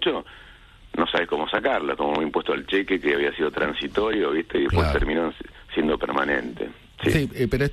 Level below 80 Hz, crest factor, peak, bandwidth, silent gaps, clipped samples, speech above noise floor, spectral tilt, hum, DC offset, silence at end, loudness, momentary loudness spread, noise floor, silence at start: -38 dBFS; 18 dB; -6 dBFS; 13 kHz; none; under 0.1%; 25 dB; -6.5 dB/octave; none; under 0.1%; 0 s; -24 LUFS; 8 LU; -48 dBFS; 0 s